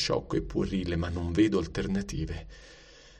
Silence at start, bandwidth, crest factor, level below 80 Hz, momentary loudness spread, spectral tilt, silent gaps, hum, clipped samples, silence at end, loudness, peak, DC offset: 0 s; 9.8 kHz; 16 dB; -42 dBFS; 14 LU; -6 dB/octave; none; none; under 0.1%; 0 s; -30 LUFS; -14 dBFS; under 0.1%